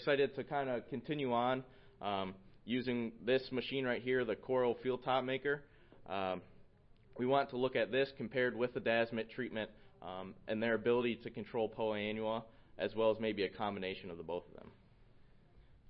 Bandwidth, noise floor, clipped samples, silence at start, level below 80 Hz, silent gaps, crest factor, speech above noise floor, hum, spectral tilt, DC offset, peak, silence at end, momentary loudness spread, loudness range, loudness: 5.6 kHz; -63 dBFS; under 0.1%; 0 s; -68 dBFS; none; 18 dB; 26 dB; none; -3.5 dB/octave; under 0.1%; -20 dBFS; 0.65 s; 11 LU; 2 LU; -38 LUFS